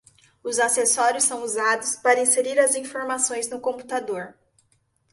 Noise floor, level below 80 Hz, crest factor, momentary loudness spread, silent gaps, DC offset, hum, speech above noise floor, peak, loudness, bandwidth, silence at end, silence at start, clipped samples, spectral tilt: -67 dBFS; -70 dBFS; 20 dB; 11 LU; none; under 0.1%; none; 44 dB; -4 dBFS; -22 LUFS; 12 kHz; 0.8 s; 0.45 s; under 0.1%; -0.5 dB/octave